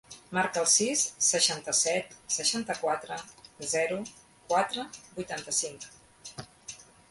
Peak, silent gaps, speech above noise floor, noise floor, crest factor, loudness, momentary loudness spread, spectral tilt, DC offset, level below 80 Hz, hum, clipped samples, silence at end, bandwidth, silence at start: -10 dBFS; none; 19 dB; -49 dBFS; 22 dB; -28 LUFS; 22 LU; -1 dB/octave; under 0.1%; -68 dBFS; none; under 0.1%; 0.3 s; 12 kHz; 0.1 s